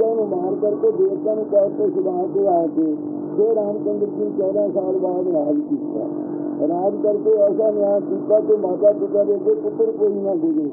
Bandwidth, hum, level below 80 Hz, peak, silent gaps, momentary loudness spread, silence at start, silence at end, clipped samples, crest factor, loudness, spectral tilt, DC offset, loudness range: 1.8 kHz; none; -80 dBFS; -4 dBFS; none; 6 LU; 0 s; 0 s; under 0.1%; 14 dB; -20 LUFS; -15.5 dB/octave; under 0.1%; 3 LU